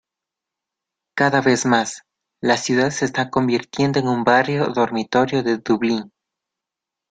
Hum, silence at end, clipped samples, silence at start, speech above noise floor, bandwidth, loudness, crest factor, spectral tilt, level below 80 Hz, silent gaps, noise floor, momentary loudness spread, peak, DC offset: none; 1.05 s; under 0.1%; 1.15 s; 67 dB; 9.4 kHz; -19 LUFS; 20 dB; -5 dB/octave; -58 dBFS; none; -85 dBFS; 6 LU; -2 dBFS; under 0.1%